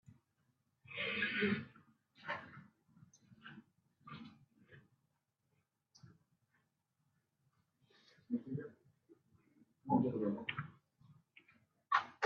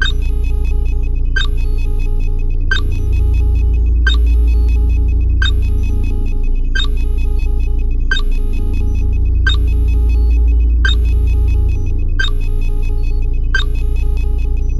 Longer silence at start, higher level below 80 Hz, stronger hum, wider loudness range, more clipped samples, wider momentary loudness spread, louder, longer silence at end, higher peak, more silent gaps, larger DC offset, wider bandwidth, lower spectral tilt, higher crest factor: about the same, 0.1 s vs 0 s; second, -82 dBFS vs -12 dBFS; neither; first, 18 LU vs 4 LU; neither; first, 22 LU vs 7 LU; second, -40 LUFS vs -17 LUFS; about the same, 0 s vs 0 s; second, -18 dBFS vs 0 dBFS; neither; neither; second, 7 kHz vs 7.8 kHz; second, -3.5 dB/octave vs -5.5 dB/octave; first, 26 dB vs 12 dB